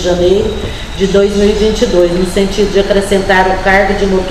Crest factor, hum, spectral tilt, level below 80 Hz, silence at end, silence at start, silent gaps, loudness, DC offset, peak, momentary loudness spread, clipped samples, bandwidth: 10 dB; none; -5 dB/octave; -22 dBFS; 0 s; 0 s; none; -11 LUFS; 2%; 0 dBFS; 4 LU; 0.2%; 14 kHz